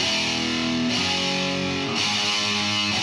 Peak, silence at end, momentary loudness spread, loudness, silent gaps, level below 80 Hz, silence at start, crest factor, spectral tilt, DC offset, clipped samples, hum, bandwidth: -8 dBFS; 0 s; 3 LU; -22 LUFS; none; -54 dBFS; 0 s; 16 dB; -2.5 dB/octave; under 0.1%; under 0.1%; none; 14 kHz